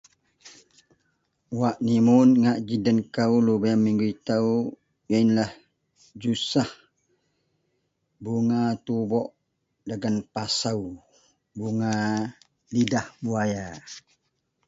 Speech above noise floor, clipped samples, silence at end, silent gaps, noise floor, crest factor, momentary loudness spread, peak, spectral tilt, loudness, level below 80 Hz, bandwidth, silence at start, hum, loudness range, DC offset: 52 dB; under 0.1%; 0.7 s; none; -76 dBFS; 18 dB; 15 LU; -8 dBFS; -6 dB/octave; -24 LUFS; -62 dBFS; 7.8 kHz; 0.45 s; none; 8 LU; under 0.1%